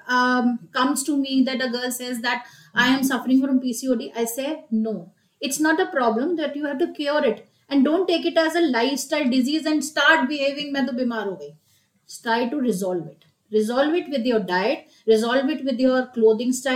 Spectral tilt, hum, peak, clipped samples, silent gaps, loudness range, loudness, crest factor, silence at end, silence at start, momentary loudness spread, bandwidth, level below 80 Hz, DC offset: -3.5 dB/octave; none; -4 dBFS; under 0.1%; none; 4 LU; -22 LUFS; 18 dB; 0 s; 0.05 s; 8 LU; 16.5 kHz; -70 dBFS; under 0.1%